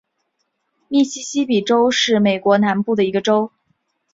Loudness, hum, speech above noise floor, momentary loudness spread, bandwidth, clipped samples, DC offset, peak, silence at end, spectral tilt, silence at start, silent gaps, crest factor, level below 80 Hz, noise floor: -17 LUFS; none; 55 dB; 5 LU; 7.8 kHz; under 0.1%; under 0.1%; -2 dBFS; 0.65 s; -4.5 dB/octave; 0.9 s; none; 16 dB; -62 dBFS; -71 dBFS